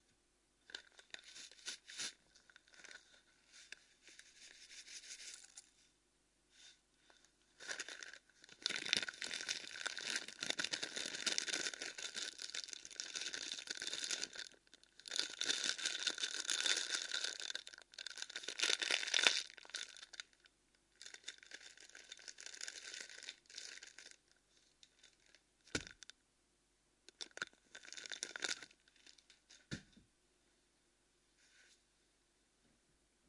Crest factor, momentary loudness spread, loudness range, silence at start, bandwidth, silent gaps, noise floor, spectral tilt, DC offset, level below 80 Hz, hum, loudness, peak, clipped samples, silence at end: 40 dB; 21 LU; 17 LU; 0.7 s; 11.5 kHz; none; -78 dBFS; 1 dB/octave; under 0.1%; -80 dBFS; none; -42 LUFS; -8 dBFS; under 0.1%; 1.55 s